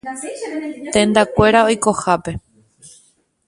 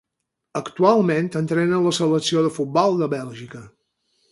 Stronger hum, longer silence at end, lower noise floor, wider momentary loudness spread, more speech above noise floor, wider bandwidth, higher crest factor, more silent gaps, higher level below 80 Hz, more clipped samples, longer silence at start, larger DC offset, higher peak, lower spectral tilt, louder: neither; about the same, 0.6 s vs 0.65 s; second, -56 dBFS vs -80 dBFS; about the same, 15 LU vs 16 LU; second, 40 dB vs 60 dB; about the same, 11.5 kHz vs 11.5 kHz; about the same, 18 dB vs 20 dB; neither; first, -42 dBFS vs -66 dBFS; neither; second, 0.05 s vs 0.55 s; neither; about the same, 0 dBFS vs -2 dBFS; about the same, -4.5 dB/octave vs -5.5 dB/octave; first, -16 LUFS vs -20 LUFS